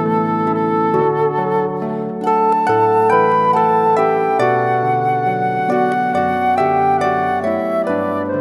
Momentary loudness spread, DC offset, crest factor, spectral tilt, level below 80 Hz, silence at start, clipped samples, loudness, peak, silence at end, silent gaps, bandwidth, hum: 5 LU; under 0.1%; 14 dB; -7.5 dB/octave; -62 dBFS; 0 s; under 0.1%; -16 LUFS; -2 dBFS; 0 s; none; 12 kHz; none